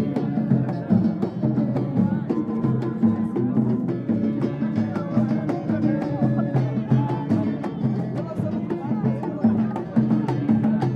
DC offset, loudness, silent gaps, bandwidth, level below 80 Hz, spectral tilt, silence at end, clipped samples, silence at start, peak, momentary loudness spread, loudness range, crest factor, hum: under 0.1%; -23 LUFS; none; 5.8 kHz; -56 dBFS; -10.5 dB/octave; 0 s; under 0.1%; 0 s; -6 dBFS; 4 LU; 1 LU; 16 dB; none